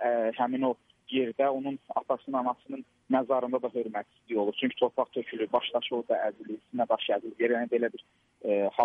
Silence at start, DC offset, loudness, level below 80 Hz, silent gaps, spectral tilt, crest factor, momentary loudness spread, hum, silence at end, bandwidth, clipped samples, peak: 0 s; under 0.1%; -30 LUFS; -78 dBFS; none; -7 dB/octave; 18 dB; 9 LU; none; 0 s; 3.8 kHz; under 0.1%; -12 dBFS